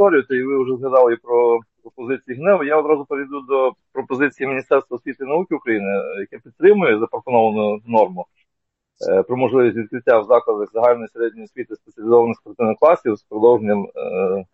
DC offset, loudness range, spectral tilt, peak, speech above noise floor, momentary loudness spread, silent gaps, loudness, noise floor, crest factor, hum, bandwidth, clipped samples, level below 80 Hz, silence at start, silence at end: under 0.1%; 3 LU; -8.5 dB/octave; -2 dBFS; 61 dB; 13 LU; none; -18 LUFS; -78 dBFS; 16 dB; none; 6.2 kHz; under 0.1%; -66 dBFS; 0 s; 0.1 s